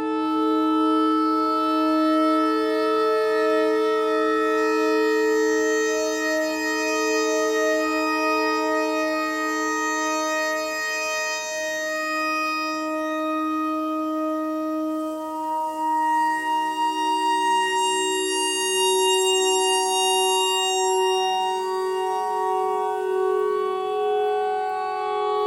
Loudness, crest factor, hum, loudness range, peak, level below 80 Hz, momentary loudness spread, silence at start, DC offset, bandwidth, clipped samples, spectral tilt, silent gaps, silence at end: -22 LUFS; 12 dB; none; 5 LU; -10 dBFS; -66 dBFS; 6 LU; 0 s; under 0.1%; 16.5 kHz; under 0.1%; -1 dB/octave; none; 0 s